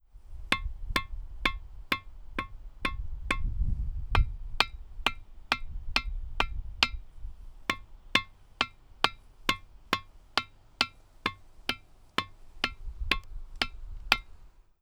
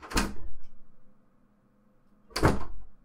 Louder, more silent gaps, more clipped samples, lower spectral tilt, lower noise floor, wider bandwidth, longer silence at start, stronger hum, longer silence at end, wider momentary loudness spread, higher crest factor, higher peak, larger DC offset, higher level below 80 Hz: about the same, -32 LUFS vs -30 LUFS; neither; neither; second, -3 dB/octave vs -5 dB/octave; second, -51 dBFS vs -64 dBFS; first, 19.5 kHz vs 16 kHz; first, 0.15 s vs 0 s; neither; about the same, 0.2 s vs 0.1 s; second, 16 LU vs 21 LU; first, 32 dB vs 20 dB; first, -2 dBFS vs -10 dBFS; neither; about the same, -38 dBFS vs -40 dBFS